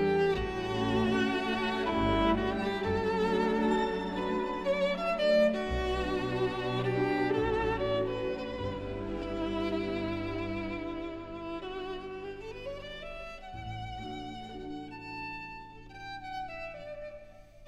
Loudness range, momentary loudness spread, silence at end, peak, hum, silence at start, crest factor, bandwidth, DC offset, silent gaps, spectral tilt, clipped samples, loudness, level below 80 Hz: 12 LU; 14 LU; 0 s; -16 dBFS; none; 0 s; 16 dB; 12 kHz; under 0.1%; none; -6.5 dB/octave; under 0.1%; -32 LUFS; -46 dBFS